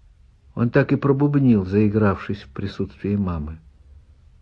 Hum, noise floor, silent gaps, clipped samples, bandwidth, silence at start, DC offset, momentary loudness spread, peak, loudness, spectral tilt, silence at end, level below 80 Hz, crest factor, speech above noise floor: none; -51 dBFS; none; under 0.1%; 6 kHz; 0.55 s; under 0.1%; 13 LU; -4 dBFS; -21 LUFS; -10 dB/octave; 0.45 s; -44 dBFS; 18 dB; 32 dB